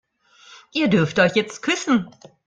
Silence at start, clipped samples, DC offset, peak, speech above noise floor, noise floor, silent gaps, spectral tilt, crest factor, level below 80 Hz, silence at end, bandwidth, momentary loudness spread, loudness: 0.5 s; under 0.1%; under 0.1%; -4 dBFS; 31 dB; -51 dBFS; none; -5 dB/octave; 18 dB; -58 dBFS; 0.4 s; 9.4 kHz; 8 LU; -20 LUFS